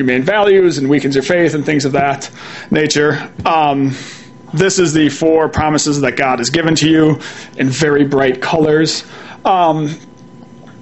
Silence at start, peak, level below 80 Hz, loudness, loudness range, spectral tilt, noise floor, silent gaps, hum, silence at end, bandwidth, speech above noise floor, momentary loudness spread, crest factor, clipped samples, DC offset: 0 s; 0 dBFS; -44 dBFS; -13 LUFS; 2 LU; -5 dB/octave; -37 dBFS; none; none; 0 s; 8.4 kHz; 24 dB; 11 LU; 14 dB; under 0.1%; 0.4%